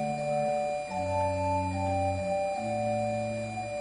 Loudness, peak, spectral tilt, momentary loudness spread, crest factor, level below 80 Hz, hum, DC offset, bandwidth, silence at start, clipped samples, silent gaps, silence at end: -30 LUFS; -18 dBFS; -6.5 dB/octave; 4 LU; 12 dB; -58 dBFS; none; under 0.1%; 11 kHz; 0 s; under 0.1%; none; 0 s